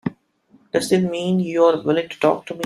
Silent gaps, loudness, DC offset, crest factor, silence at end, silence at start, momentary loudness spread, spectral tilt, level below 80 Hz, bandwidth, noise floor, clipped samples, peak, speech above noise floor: none; -19 LUFS; under 0.1%; 18 dB; 0 s; 0.05 s; 7 LU; -6 dB/octave; -62 dBFS; 13.5 kHz; -56 dBFS; under 0.1%; -2 dBFS; 38 dB